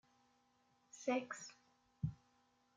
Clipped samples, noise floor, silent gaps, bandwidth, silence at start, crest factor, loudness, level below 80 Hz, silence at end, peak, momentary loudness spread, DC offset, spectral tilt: under 0.1%; -77 dBFS; none; 9.6 kHz; 0.95 s; 22 dB; -45 LUFS; -72 dBFS; 0.6 s; -26 dBFS; 14 LU; under 0.1%; -5.5 dB/octave